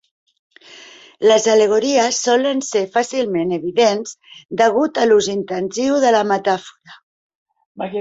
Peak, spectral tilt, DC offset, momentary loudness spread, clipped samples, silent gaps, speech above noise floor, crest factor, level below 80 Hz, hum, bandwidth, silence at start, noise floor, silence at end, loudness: -2 dBFS; -3.5 dB/octave; under 0.1%; 9 LU; under 0.1%; 4.45-4.49 s, 7.03-7.46 s, 7.66-7.75 s; 26 dB; 16 dB; -62 dBFS; none; 8 kHz; 0.75 s; -42 dBFS; 0 s; -16 LUFS